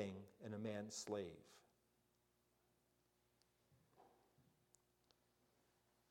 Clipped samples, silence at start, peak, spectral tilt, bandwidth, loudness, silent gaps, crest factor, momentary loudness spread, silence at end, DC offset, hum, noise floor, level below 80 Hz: under 0.1%; 0 s; -32 dBFS; -4.5 dB/octave; 16 kHz; -50 LUFS; none; 24 dB; 14 LU; 1.7 s; under 0.1%; 60 Hz at -90 dBFS; -83 dBFS; -88 dBFS